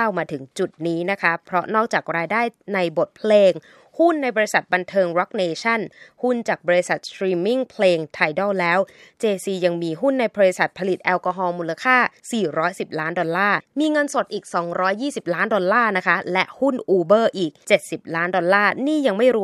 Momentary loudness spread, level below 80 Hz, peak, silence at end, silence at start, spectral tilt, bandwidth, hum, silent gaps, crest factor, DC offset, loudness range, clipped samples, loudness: 7 LU; -72 dBFS; -2 dBFS; 0 s; 0 s; -5 dB/octave; 13.5 kHz; none; none; 20 dB; under 0.1%; 2 LU; under 0.1%; -20 LUFS